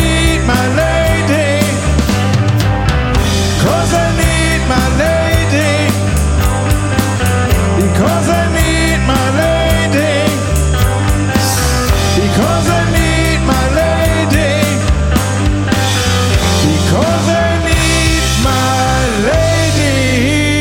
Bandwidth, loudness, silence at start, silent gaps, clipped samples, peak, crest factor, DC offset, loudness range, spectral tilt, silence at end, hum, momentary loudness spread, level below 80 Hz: 17 kHz; -12 LUFS; 0 s; none; under 0.1%; 0 dBFS; 12 dB; under 0.1%; 1 LU; -5 dB/octave; 0 s; none; 2 LU; -18 dBFS